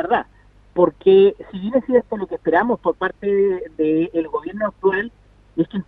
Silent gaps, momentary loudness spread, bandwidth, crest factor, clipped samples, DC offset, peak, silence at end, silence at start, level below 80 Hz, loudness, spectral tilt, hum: none; 13 LU; 4 kHz; 18 dB; under 0.1%; under 0.1%; -2 dBFS; 0.05 s; 0 s; -52 dBFS; -19 LUFS; -9 dB/octave; none